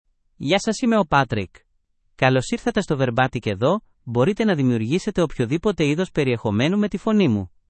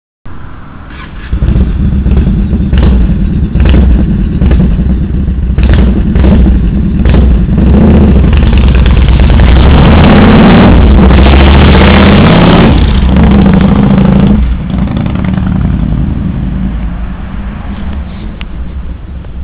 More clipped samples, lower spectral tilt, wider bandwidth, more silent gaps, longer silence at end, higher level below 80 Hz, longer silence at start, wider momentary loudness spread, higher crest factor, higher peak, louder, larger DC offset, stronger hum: second, under 0.1% vs 10%; second, -6 dB/octave vs -11.5 dB/octave; first, 8.8 kHz vs 4 kHz; neither; first, 0.25 s vs 0 s; second, -48 dBFS vs -8 dBFS; first, 0.4 s vs 0.25 s; second, 4 LU vs 17 LU; first, 18 dB vs 6 dB; about the same, -2 dBFS vs 0 dBFS; second, -21 LUFS vs -6 LUFS; neither; neither